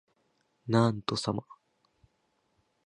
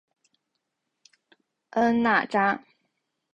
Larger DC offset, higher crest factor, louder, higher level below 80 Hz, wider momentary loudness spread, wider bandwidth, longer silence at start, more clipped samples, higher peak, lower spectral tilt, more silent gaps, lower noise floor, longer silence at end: neither; about the same, 24 dB vs 20 dB; second, -30 LUFS vs -24 LUFS; about the same, -66 dBFS vs -66 dBFS; about the same, 12 LU vs 10 LU; first, 11 kHz vs 7.8 kHz; second, 0.65 s vs 1.75 s; neither; about the same, -10 dBFS vs -10 dBFS; about the same, -6 dB/octave vs -6 dB/octave; neither; second, -75 dBFS vs -80 dBFS; first, 1.35 s vs 0.75 s